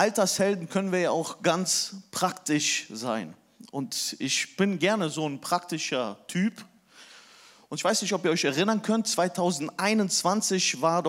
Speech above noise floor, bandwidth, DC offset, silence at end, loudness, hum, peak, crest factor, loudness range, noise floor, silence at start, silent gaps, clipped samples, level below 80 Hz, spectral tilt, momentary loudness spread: 27 dB; 16 kHz; under 0.1%; 0 s; -26 LUFS; none; -8 dBFS; 20 dB; 4 LU; -54 dBFS; 0 s; none; under 0.1%; -78 dBFS; -3.5 dB/octave; 8 LU